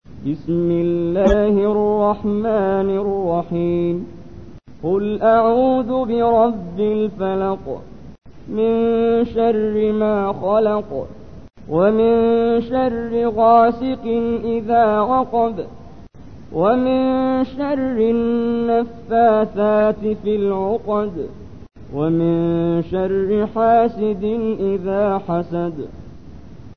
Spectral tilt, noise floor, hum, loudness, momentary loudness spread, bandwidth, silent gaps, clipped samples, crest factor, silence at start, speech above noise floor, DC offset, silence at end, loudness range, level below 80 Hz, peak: -9 dB/octave; -39 dBFS; none; -18 LUFS; 9 LU; 6.4 kHz; none; under 0.1%; 16 dB; 0 s; 22 dB; 0.9%; 0.05 s; 3 LU; -42 dBFS; -2 dBFS